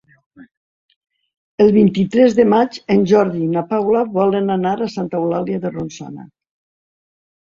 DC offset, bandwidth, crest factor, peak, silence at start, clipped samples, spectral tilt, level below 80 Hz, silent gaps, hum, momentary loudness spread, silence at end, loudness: under 0.1%; 7.4 kHz; 16 dB; -2 dBFS; 0.4 s; under 0.1%; -7.5 dB/octave; -54 dBFS; 0.57-0.89 s, 0.96-1.01 s, 1.37-1.58 s; none; 16 LU; 1.2 s; -16 LUFS